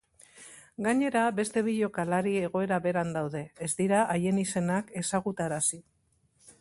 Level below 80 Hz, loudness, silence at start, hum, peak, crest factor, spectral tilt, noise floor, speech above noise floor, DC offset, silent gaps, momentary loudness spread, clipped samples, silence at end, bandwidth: -66 dBFS; -29 LUFS; 0.35 s; none; -12 dBFS; 18 dB; -5 dB/octave; -69 dBFS; 41 dB; under 0.1%; none; 9 LU; under 0.1%; 0.8 s; 11.5 kHz